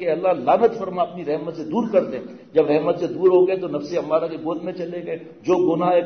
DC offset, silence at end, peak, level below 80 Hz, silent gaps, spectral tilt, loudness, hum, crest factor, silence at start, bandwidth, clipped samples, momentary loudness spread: under 0.1%; 0 s; -6 dBFS; -66 dBFS; none; -7.5 dB/octave; -21 LUFS; none; 14 dB; 0 s; 6.6 kHz; under 0.1%; 11 LU